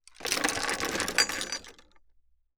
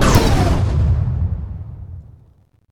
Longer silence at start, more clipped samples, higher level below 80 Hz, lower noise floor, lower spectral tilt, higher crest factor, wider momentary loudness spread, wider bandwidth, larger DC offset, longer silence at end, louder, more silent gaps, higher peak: first, 0.2 s vs 0 s; neither; second, -56 dBFS vs -22 dBFS; first, -64 dBFS vs -52 dBFS; second, -0.5 dB/octave vs -6 dB/octave; first, 26 dB vs 18 dB; second, 9 LU vs 21 LU; about the same, over 20 kHz vs 19 kHz; neither; about the same, 0.6 s vs 0.7 s; second, -28 LUFS vs -17 LUFS; neither; second, -8 dBFS vs 0 dBFS